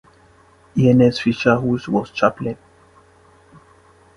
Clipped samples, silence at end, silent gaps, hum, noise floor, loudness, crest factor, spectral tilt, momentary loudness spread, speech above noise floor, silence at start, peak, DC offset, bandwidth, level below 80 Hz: under 0.1%; 1.6 s; none; none; -51 dBFS; -18 LUFS; 20 dB; -7.5 dB/octave; 15 LU; 35 dB; 0.75 s; 0 dBFS; under 0.1%; 10.5 kHz; -50 dBFS